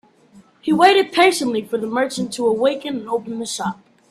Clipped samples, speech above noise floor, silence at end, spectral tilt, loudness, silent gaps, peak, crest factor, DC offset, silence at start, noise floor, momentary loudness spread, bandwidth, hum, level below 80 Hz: under 0.1%; 32 dB; 0.4 s; -3.5 dB/octave; -18 LUFS; none; 0 dBFS; 18 dB; under 0.1%; 0.35 s; -50 dBFS; 13 LU; 14.5 kHz; none; -64 dBFS